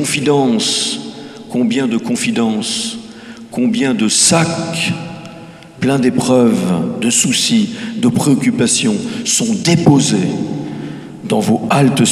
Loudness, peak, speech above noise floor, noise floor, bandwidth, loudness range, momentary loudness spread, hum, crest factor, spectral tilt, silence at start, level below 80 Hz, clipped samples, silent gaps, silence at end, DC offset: -14 LUFS; 0 dBFS; 21 dB; -34 dBFS; 14.5 kHz; 3 LU; 16 LU; none; 14 dB; -4 dB/octave; 0 s; -52 dBFS; under 0.1%; none; 0 s; under 0.1%